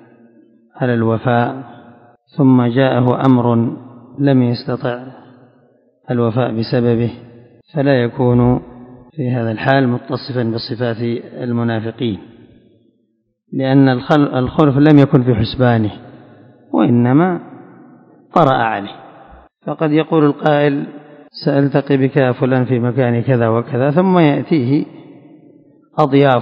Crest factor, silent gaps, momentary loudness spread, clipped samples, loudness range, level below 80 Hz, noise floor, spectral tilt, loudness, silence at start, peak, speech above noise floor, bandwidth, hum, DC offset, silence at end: 16 dB; none; 12 LU; under 0.1%; 5 LU; -46 dBFS; -64 dBFS; -10 dB/octave; -15 LUFS; 0.75 s; 0 dBFS; 50 dB; 5.4 kHz; none; under 0.1%; 0 s